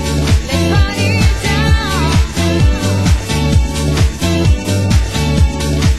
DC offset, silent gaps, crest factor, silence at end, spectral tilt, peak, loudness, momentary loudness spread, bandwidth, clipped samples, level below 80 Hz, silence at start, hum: 2%; none; 12 dB; 0 s; -5.5 dB/octave; 0 dBFS; -14 LUFS; 2 LU; 12.5 kHz; under 0.1%; -16 dBFS; 0 s; none